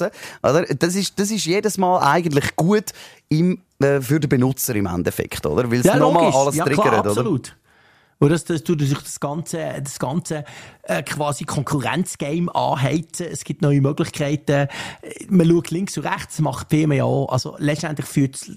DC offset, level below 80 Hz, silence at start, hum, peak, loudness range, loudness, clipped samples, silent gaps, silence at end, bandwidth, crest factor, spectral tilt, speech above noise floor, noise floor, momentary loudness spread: under 0.1%; -50 dBFS; 0 s; none; -4 dBFS; 5 LU; -20 LUFS; under 0.1%; none; 0 s; 15.5 kHz; 16 dB; -5.5 dB/octave; 35 dB; -55 dBFS; 10 LU